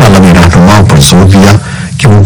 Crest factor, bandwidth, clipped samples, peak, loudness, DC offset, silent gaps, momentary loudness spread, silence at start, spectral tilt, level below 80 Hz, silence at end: 2 dB; over 20 kHz; 50%; 0 dBFS; -3 LUFS; under 0.1%; none; 7 LU; 0 s; -5.5 dB/octave; -18 dBFS; 0 s